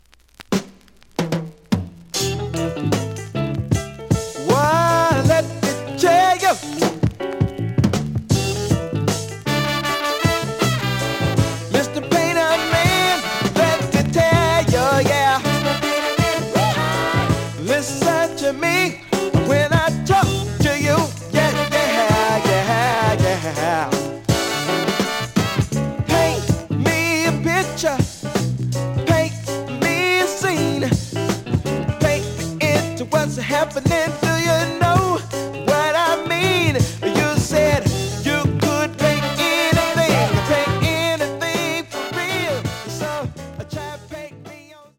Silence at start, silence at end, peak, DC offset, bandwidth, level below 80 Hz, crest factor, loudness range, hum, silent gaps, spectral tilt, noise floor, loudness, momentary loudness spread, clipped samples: 0.4 s; 0.25 s; -2 dBFS; under 0.1%; 17 kHz; -40 dBFS; 18 dB; 4 LU; none; none; -5 dB/octave; -47 dBFS; -19 LUFS; 8 LU; under 0.1%